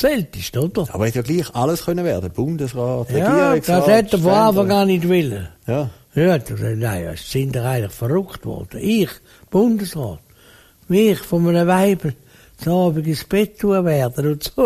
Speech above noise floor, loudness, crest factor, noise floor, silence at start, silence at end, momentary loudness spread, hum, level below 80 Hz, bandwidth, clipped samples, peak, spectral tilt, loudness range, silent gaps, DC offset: 31 dB; -18 LUFS; 16 dB; -49 dBFS; 0 s; 0 s; 10 LU; none; -44 dBFS; 15.5 kHz; under 0.1%; -2 dBFS; -6.5 dB/octave; 5 LU; none; under 0.1%